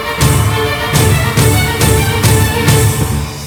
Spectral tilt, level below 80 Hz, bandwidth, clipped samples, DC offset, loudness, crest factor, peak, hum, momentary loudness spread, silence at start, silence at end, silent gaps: -4.5 dB/octave; -24 dBFS; over 20 kHz; 0.2%; under 0.1%; -11 LUFS; 12 dB; 0 dBFS; none; 3 LU; 0 s; 0 s; none